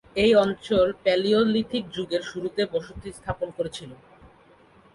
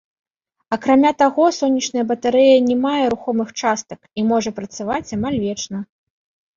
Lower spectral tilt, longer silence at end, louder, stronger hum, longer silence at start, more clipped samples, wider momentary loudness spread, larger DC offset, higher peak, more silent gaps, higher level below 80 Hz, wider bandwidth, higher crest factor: about the same, -5.5 dB/octave vs -4.5 dB/octave; first, 1 s vs 0.75 s; second, -24 LUFS vs -18 LUFS; neither; second, 0.15 s vs 0.7 s; neither; about the same, 15 LU vs 13 LU; neither; second, -8 dBFS vs -2 dBFS; neither; about the same, -50 dBFS vs -54 dBFS; first, 11.5 kHz vs 7.6 kHz; about the same, 18 dB vs 16 dB